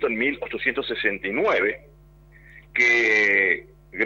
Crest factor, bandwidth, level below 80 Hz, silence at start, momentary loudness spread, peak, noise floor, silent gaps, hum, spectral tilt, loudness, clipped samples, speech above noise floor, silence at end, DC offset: 18 dB; 16 kHz; -54 dBFS; 0 s; 10 LU; -6 dBFS; -50 dBFS; none; none; -3.5 dB/octave; -21 LUFS; under 0.1%; 28 dB; 0 s; under 0.1%